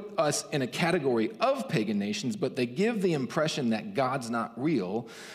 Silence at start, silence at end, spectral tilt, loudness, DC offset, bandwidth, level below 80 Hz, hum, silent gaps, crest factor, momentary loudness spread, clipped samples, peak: 0 s; 0 s; -5 dB/octave; -29 LUFS; under 0.1%; 15.5 kHz; -72 dBFS; none; none; 18 dB; 4 LU; under 0.1%; -12 dBFS